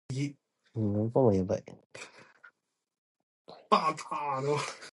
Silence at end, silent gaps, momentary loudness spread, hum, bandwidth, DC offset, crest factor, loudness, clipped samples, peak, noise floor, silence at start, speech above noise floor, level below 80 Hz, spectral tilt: 0.05 s; 1.86-1.90 s, 2.98-3.15 s, 3.23-3.45 s; 21 LU; none; 11.5 kHz; under 0.1%; 24 dB; -30 LUFS; under 0.1%; -8 dBFS; -64 dBFS; 0.1 s; 34 dB; -60 dBFS; -6.5 dB/octave